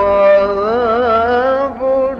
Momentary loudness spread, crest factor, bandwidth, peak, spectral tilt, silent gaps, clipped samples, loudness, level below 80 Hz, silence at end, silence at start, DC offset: 6 LU; 10 dB; 6.2 kHz; -2 dBFS; -7 dB/octave; none; under 0.1%; -13 LUFS; -40 dBFS; 0 s; 0 s; under 0.1%